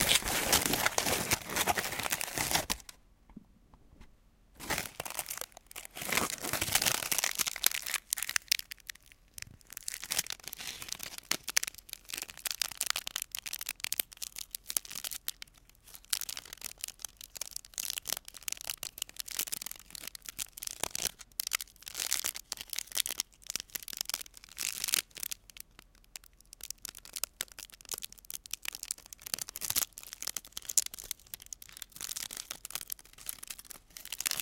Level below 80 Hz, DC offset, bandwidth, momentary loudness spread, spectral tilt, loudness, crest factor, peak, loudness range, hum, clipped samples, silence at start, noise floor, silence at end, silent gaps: -60 dBFS; under 0.1%; 17 kHz; 15 LU; -0.5 dB/octave; -34 LUFS; 36 dB; -2 dBFS; 8 LU; none; under 0.1%; 0 s; -62 dBFS; 0 s; none